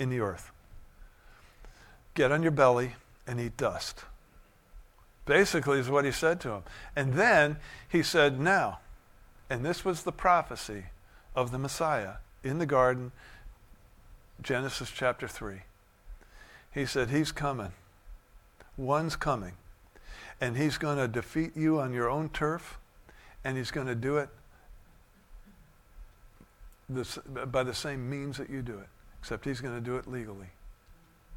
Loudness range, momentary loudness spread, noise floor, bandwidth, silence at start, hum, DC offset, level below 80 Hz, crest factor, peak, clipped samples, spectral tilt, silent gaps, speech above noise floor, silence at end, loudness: 10 LU; 18 LU; -59 dBFS; 17.5 kHz; 0 s; none; under 0.1%; -52 dBFS; 24 dB; -8 dBFS; under 0.1%; -5 dB/octave; none; 29 dB; 0 s; -30 LUFS